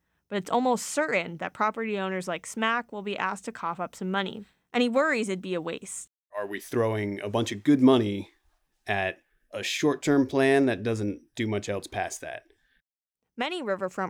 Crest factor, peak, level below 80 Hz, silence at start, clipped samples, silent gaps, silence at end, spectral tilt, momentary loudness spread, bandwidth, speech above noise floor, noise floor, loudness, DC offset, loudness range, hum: 20 dB; -8 dBFS; -68 dBFS; 0.3 s; under 0.1%; 6.18-6.23 s; 0 s; -5 dB/octave; 14 LU; 16.5 kHz; 59 dB; -86 dBFS; -28 LUFS; under 0.1%; 4 LU; none